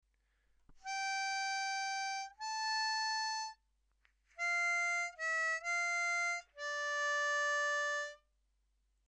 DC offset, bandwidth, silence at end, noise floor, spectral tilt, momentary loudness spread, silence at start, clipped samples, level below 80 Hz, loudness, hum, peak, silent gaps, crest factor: under 0.1%; 12.5 kHz; 0.9 s; -78 dBFS; 4 dB/octave; 8 LU; 0.7 s; under 0.1%; -76 dBFS; -36 LUFS; none; -26 dBFS; none; 12 dB